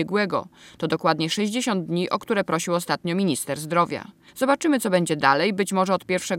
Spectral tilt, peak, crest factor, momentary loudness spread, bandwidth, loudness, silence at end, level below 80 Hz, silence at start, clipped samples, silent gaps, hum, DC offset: -4.5 dB/octave; -2 dBFS; 20 dB; 7 LU; 17 kHz; -23 LUFS; 0 s; -68 dBFS; 0 s; under 0.1%; none; none; under 0.1%